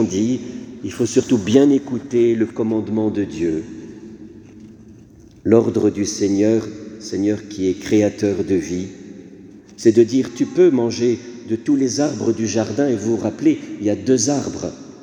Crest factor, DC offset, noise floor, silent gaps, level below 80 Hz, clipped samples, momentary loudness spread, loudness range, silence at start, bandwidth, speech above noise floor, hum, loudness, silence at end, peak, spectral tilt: 18 dB; under 0.1%; -44 dBFS; none; -54 dBFS; under 0.1%; 16 LU; 4 LU; 0 s; 10.5 kHz; 27 dB; none; -19 LUFS; 0 s; 0 dBFS; -5.5 dB/octave